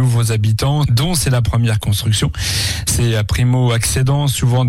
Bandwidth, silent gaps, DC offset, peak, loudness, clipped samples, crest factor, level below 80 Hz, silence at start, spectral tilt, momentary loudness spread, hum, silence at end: 16 kHz; none; under 0.1%; -6 dBFS; -15 LUFS; under 0.1%; 8 dB; -30 dBFS; 0 s; -4.5 dB/octave; 2 LU; none; 0 s